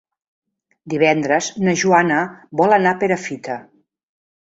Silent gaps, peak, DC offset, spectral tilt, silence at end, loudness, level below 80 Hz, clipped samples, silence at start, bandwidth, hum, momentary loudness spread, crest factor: none; 0 dBFS; under 0.1%; -5 dB/octave; 0.8 s; -17 LUFS; -62 dBFS; under 0.1%; 0.85 s; 8 kHz; none; 12 LU; 18 dB